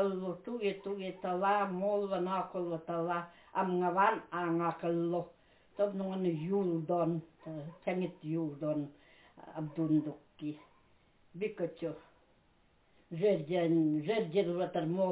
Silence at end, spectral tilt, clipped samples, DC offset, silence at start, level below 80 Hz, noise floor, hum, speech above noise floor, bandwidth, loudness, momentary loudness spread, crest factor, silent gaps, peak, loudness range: 0 s; -6.5 dB/octave; under 0.1%; under 0.1%; 0 s; -76 dBFS; -69 dBFS; none; 35 dB; 4 kHz; -35 LUFS; 13 LU; 18 dB; none; -16 dBFS; 5 LU